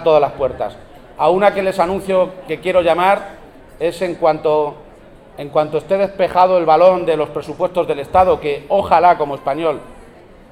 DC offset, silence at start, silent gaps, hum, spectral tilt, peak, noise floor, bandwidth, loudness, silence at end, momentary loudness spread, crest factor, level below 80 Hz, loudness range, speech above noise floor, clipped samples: under 0.1%; 0 s; none; none; -6 dB/octave; 0 dBFS; -41 dBFS; 13.5 kHz; -16 LUFS; 0.5 s; 11 LU; 16 dB; -44 dBFS; 4 LU; 26 dB; under 0.1%